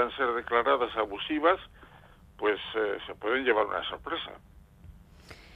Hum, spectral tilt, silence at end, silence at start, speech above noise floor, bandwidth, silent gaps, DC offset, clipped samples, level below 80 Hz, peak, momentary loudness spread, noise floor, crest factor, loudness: none; -5.5 dB/octave; 0 s; 0 s; 25 dB; 9.6 kHz; none; under 0.1%; under 0.1%; -58 dBFS; -10 dBFS; 9 LU; -55 dBFS; 20 dB; -29 LUFS